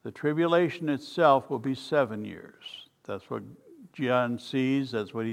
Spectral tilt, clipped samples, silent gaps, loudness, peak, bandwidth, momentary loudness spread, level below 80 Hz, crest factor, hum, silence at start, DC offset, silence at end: -7 dB/octave; under 0.1%; none; -27 LUFS; -8 dBFS; 13.5 kHz; 20 LU; -74 dBFS; 20 dB; none; 0.05 s; under 0.1%; 0 s